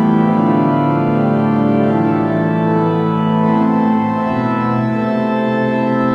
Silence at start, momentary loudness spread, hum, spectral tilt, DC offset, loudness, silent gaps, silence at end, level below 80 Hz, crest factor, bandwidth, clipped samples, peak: 0 s; 3 LU; none; -9.5 dB/octave; under 0.1%; -15 LUFS; none; 0 s; -52 dBFS; 12 dB; 5.6 kHz; under 0.1%; -2 dBFS